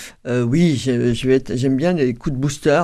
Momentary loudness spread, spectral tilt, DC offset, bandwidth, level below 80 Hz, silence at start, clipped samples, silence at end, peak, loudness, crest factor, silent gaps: 5 LU; -6.5 dB/octave; under 0.1%; 13 kHz; -40 dBFS; 0 s; under 0.1%; 0 s; -4 dBFS; -18 LUFS; 14 dB; none